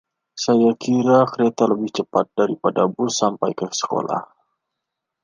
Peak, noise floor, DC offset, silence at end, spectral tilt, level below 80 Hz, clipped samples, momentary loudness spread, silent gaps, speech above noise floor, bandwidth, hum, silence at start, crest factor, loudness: -2 dBFS; -81 dBFS; under 0.1%; 1 s; -5 dB/octave; -66 dBFS; under 0.1%; 8 LU; none; 62 dB; 9.8 kHz; none; 0.35 s; 18 dB; -20 LUFS